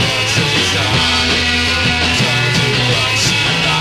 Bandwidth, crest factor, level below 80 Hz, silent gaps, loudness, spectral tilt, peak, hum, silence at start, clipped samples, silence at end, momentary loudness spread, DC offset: 16 kHz; 12 dB; -32 dBFS; none; -12 LUFS; -3 dB/octave; -2 dBFS; none; 0 s; under 0.1%; 0 s; 1 LU; under 0.1%